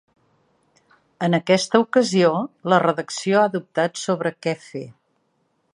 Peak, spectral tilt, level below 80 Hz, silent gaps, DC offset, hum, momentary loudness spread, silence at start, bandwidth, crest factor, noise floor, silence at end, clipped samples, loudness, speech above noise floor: -2 dBFS; -5 dB/octave; -70 dBFS; none; under 0.1%; none; 10 LU; 1.2 s; 11.5 kHz; 20 dB; -68 dBFS; 0.85 s; under 0.1%; -20 LUFS; 48 dB